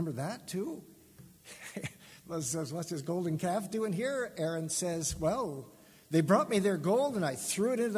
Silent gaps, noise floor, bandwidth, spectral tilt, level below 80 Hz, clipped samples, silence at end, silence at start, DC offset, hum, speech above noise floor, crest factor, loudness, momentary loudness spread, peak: none; -57 dBFS; 16 kHz; -5 dB/octave; -60 dBFS; under 0.1%; 0 s; 0 s; under 0.1%; none; 24 dB; 20 dB; -33 LUFS; 16 LU; -12 dBFS